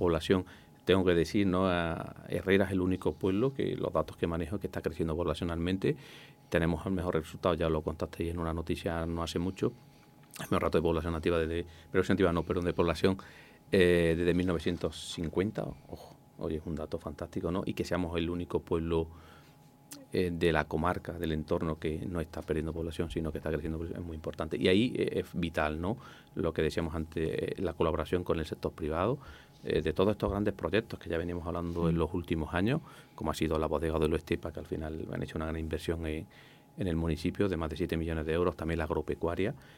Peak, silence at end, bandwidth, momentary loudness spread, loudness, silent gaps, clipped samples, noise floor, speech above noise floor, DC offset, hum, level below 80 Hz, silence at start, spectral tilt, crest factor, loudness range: -10 dBFS; 0.05 s; 16.5 kHz; 10 LU; -32 LUFS; none; under 0.1%; -58 dBFS; 26 dB; under 0.1%; none; -50 dBFS; 0 s; -6.5 dB/octave; 22 dB; 5 LU